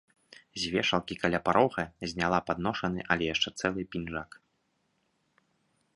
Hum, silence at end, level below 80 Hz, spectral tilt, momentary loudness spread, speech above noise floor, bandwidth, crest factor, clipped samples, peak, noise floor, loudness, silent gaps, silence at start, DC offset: none; 1.7 s; -56 dBFS; -4.5 dB/octave; 10 LU; 45 dB; 11.5 kHz; 26 dB; under 0.1%; -6 dBFS; -75 dBFS; -30 LUFS; none; 0.55 s; under 0.1%